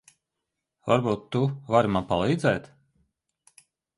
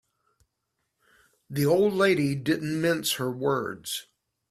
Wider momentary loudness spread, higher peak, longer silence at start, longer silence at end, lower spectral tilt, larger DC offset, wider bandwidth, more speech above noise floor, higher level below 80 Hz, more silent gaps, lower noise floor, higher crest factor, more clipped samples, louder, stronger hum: second, 5 LU vs 12 LU; first, -6 dBFS vs -10 dBFS; second, 0.85 s vs 1.5 s; first, 1.3 s vs 0.5 s; first, -7 dB/octave vs -5 dB/octave; neither; second, 11.5 kHz vs 16 kHz; first, 60 dB vs 54 dB; first, -54 dBFS vs -64 dBFS; neither; first, -84 dBFS vs -80 dBFS; about the same, 22 dB vs 18 dB; neither; about the same, -25 LUFS vs -26 LUFS; neither